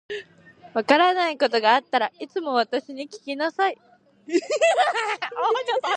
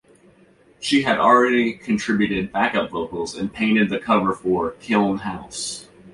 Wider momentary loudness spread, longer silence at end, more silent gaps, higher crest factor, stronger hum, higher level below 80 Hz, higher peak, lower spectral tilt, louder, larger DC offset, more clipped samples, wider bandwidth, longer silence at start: about the same, 14 LU vs 13 LU; about the same, 0 s vs 0.05 s; neither; about the same, 22 dB vs 18 dB; neither; second, -78 dBFS vs -52 dBFS; about the same, -2 dBFS vs -4 dBFS; second, -2 dB/octave vs -4.5 dB/octave; about the same, -22 LUFS vs -20 LUFS; neither; neither; about the same, 11 kHz vs 11.5 kHz; second, 0.1 s vs 0.8 s